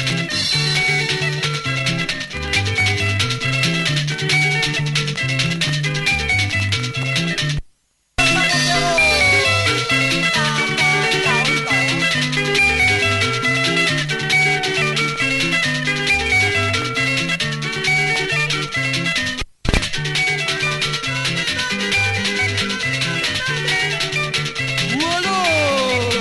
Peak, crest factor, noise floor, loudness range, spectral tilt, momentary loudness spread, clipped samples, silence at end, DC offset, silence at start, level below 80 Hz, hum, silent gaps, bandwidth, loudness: 0 dBFS; 18 dB; -59 dBFS; 4 LU; -3.5 dB/octave; 5 LU; under 0.1%; 0 s; under 0.1%; 0 s; -38 dBFS; none; none; 12 kHz; -17 LUFS